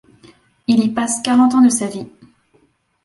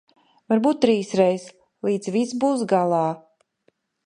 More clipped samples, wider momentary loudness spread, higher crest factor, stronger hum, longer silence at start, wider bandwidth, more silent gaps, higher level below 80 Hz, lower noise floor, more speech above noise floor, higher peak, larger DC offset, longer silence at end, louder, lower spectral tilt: neither; first, 17 LU vs 8 LU; about the same, 16 dB vs 20 dB; neither; first, 0.7 s vs 0.5 s; about the same, 11.5 kHz vs 11 kHz; neither; first, -60 dBFS vs -70 dBFS; second, -58 dBFS vs -67 dBFS; about the same, 44 dB vs 46 dB; about the same, -2 dBFS vs -4 dBFS; neither; first, 1 s vs 0.85 s; first, -15 LUFS vs -22 LUFS; second, -4 dB/octave vs -6 dB/octave